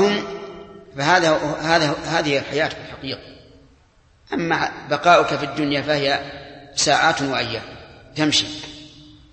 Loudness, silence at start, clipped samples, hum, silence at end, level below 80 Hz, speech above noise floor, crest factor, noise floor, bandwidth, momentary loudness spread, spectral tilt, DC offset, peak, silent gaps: -20 LUFS; 0 s; under 0.1%; none; 0.2 s; -52 dBFS; 35 dB; 20 dB; -55 dBFS; 8.8 kHz; 19 LU; -3.5 dB/octave; under 0.1%; 0 dBFS; none